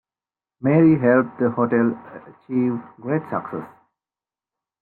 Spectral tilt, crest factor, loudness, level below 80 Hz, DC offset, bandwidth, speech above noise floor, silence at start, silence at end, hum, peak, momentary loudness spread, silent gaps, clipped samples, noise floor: -12 dB/octave; 16 dB; -20 LUFS; -62 dBFS; under 0.1%; 3 kHz; over 70 dB; 0.6 s; 1.15 s; none; -4 dBFS; 17 LU; none; under 0.1%; under -90 dBFS